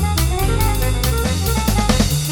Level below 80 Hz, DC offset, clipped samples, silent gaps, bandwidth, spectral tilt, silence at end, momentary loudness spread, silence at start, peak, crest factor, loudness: -20 dBFS; under 0.1%; under 0.1%; none; 17.5 kHz; -4.5 dB/octave; 0 s; 2 LU; 0 s; -2 dBFS; 14 dB; -18 LUFS